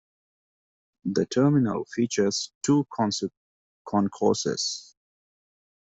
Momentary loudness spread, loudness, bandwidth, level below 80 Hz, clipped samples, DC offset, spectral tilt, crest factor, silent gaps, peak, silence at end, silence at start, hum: 8 LU; -26 LUFS; 8.2 kHz; -66 dBFS; under 0.1%; under 0.1%; -5 dB/octave; 18 dB; 2.55-2.61 s, 3.37-3.85 s; -8 dBFS; 1.05 s; 1.05 s; none